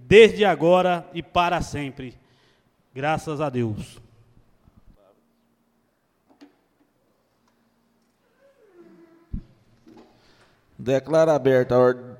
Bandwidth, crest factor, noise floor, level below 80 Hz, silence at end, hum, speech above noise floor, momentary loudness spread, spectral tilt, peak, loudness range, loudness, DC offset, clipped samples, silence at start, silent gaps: 13 kHz; 22 dB; -68 dBFS; -48 dBFS; 0.05 s; none; 49 dB; 23 LU; -6 dB/octave; -2 dBFS; 24 LU; -20 LUFS; under 0.1%; under 0.1%; 0.1 s; none